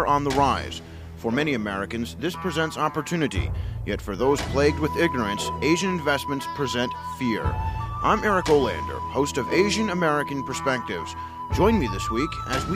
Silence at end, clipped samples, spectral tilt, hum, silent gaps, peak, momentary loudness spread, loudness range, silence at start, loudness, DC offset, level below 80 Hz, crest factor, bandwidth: 0 s; under 0.1%; -5 dB/octave; none; none; -6 dBFS; 9 LU; 3 LU; 0 s; -24 LUFS; under 0.1%; -38 dBFS; 18 dB; 15.5 kHz